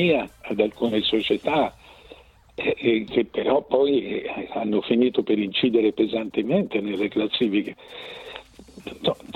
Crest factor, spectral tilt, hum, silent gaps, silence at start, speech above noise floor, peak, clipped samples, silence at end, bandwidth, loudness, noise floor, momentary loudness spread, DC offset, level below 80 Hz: 18 dB; -7 dB/octave; none; none; 0 s; 26 dB; -6 dBFS; under 0.1%; 0.05 s; 10.5 kHz; -23 LUFS; -49 dBFS; 16 LU; under 0.1%; -56 dBFS